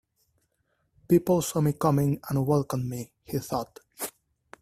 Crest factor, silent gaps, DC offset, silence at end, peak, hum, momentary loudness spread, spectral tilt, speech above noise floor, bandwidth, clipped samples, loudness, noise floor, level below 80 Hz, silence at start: 20 dB; none; under 0.1%; 0.55 s; -8 dBFS; none; 13 LU; -7 dB/octave; 48 dB; 16 kHz; under 0.1%; -27 LUFS; -74 dBFS; -58 dBFS; 1.1 s